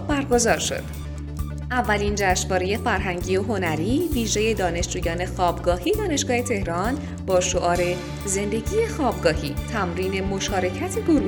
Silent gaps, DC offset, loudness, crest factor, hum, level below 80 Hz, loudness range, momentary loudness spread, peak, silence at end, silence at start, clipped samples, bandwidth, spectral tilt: none; under 0.1%; -23 LUFS; 16 dB; none; -34 dBFS; 1 LU; 6 LU; -6 dBFS; 0 s; 0 s; under 0.1%; 17.5 kHz; -4.5 dB/octave